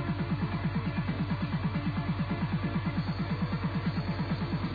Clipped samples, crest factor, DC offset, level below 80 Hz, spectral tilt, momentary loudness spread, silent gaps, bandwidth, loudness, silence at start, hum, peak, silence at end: under 0.1%; 12 dB; under 0.1%; -46 dBFS; -9.5 dB/octave; 1 LU; none; 5 kHz; -32 LUFS; 0 s; none; -18 dBFS; 0 s